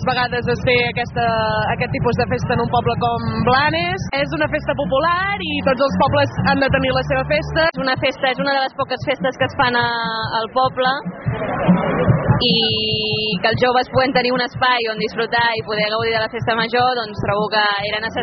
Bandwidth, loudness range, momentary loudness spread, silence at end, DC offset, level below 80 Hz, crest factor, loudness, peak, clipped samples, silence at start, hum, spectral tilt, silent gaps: 6.4 kHz; 2 LU; 5 LU; 0 s; under 0.1%; -40 dBFS; 14 dB; -18 LUFS; -4 dBFS; under 0.1%; 0 s; none; -3 dB/octave; none